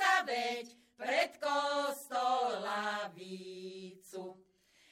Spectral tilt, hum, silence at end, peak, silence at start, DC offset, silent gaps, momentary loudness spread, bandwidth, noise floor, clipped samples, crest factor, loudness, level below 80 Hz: -2.5 dB/octave; none; 0.6 s; -16 dBFS; 0 s; under 0.1%; none; 15 LU; 16.5 kHz; -68 dBFS; under 0.1%; 20 dB; -35 LUFS; -88 dBFS